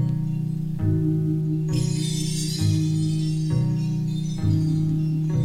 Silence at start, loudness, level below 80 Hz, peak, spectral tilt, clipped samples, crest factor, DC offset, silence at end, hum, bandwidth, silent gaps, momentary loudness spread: 0 s; -24 LUFS; -44 dBFS; -10 dBFS; -6.5 dB/octave; under 0.1%; 12 dB; under 0.1%; 0 s; none; 13 kHz; none; 4 LU